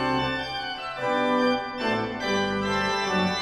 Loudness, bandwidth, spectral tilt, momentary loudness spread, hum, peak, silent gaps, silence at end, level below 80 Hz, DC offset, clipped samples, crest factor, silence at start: -26 LUFS; 13.5 kHz; -4.5 dB/octave; 6 LU; none; -12 dBFS; none; 0 s; -52 dBFS; under 0.1%; under 0.1%; 14 dB; 0 s